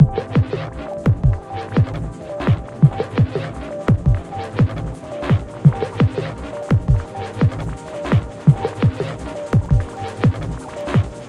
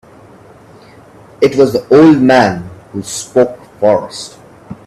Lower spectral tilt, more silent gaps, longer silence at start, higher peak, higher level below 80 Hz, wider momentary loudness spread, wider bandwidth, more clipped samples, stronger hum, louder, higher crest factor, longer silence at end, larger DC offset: first, -8.5 dB/octave vs -5.5 dB/octave; neither; second, 0 s vs 1.4 s; about the same, 0 dBFS vs 0 dBFS; first, -30 dBFS vs -50 dBFS; second, 12 LU vs 19 LU; second, 10 kHz vs 13.5 kHz; neither; neither; second, -20 LUFS vs -11 LUFS; first, 18 dB vs 12 dB; second, 0 s vs 0.15 s; neither